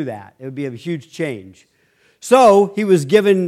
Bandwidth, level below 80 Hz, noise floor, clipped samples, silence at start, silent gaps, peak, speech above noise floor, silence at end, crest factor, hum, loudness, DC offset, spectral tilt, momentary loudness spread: 15 kHz; -64 dBFS; -55 dBFS; under 0.1%; 0 s; none; 0 dBFS; 40 dB; 0 s; 16 dB; none; -15 LUFS; under 0.1%; -6 dB/octave; 21 LU